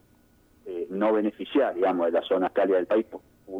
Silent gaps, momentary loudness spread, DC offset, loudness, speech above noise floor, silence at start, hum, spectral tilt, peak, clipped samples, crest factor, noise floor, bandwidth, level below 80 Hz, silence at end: none; 13 LU; under 0.1%; -25 LUFS; 36 dB; 0.65 s; none; -7.5 dB/octave; -12 dBFS; under 0.1%; 14 dB; -60 dBFS; 5.2 kHz; -66 dBFS; 0 s